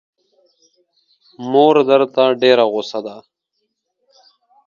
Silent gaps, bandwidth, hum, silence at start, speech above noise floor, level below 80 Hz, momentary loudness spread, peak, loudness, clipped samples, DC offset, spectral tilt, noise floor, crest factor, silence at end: none; 7.2 kHz; none; 1.4 s; 58 dB; -70 dBFS; 16 LU; 0 dBFS; -14 LUFS; under 0.1%; under 0.1%; -5.5 dB/octave; -73 dBFS; 18 dB; 1.45 s